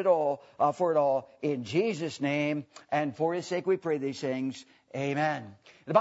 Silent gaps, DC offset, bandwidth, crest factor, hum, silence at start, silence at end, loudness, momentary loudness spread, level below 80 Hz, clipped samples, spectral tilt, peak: none; under 0.1%; 8 kHz; 20 dB; none; 0 s; 0 s; -30 LUFS; 10 LU; -78 dBFS; under 0.1%; -6 dB/octave; -8 dBFS